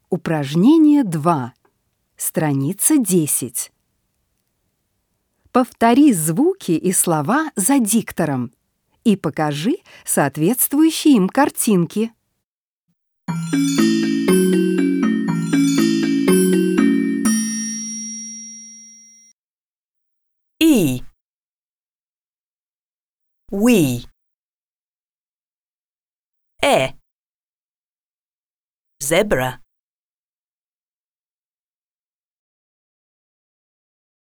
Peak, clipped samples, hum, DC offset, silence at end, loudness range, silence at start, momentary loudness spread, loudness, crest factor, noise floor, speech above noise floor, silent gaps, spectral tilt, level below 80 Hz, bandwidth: 0 dBFS; under 0.1%; none; under 0.1%; 4.7 s; 9 LU; 0.1 s; 12 LU; -17 LUFS; 18 dB; under -90 dBFS; over 74 dB; 12.44-12.87 s, 19.32-19.95 s, 21.21-23.19 s, 24.34-26.32 s, 27.12-28.85 s; -5 dB/octave; -52 dBFS; over 20 kHz